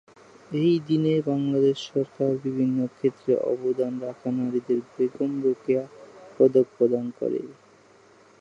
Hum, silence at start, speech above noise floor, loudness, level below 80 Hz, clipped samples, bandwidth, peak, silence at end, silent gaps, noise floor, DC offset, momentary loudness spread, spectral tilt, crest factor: none; 0.5 s; 31 dB; -25 LUFS; -74 dBFS; under 0.1%; 7.8 kHz; -6 dBFS; 0.9 s; none; -55 dBFS; under 0.1%; 8 LU; -8 dB/octave; 18 dB